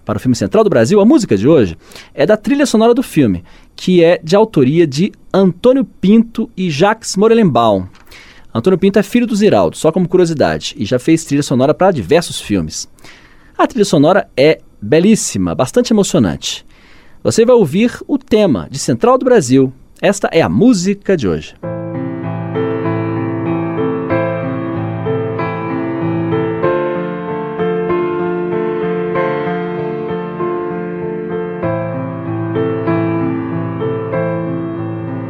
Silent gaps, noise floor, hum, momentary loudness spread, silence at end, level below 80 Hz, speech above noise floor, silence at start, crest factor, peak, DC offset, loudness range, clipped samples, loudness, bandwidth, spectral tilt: none; -39 dBFS; none; 11 LU; 0 s; -44 dBFS; 28 dB; 0.05 s; 14 dB; 0 dBFS; under 0.1%; 6 LU; under 0.1%; -14 LUFS; 15.5 kHz; -6 dB/octave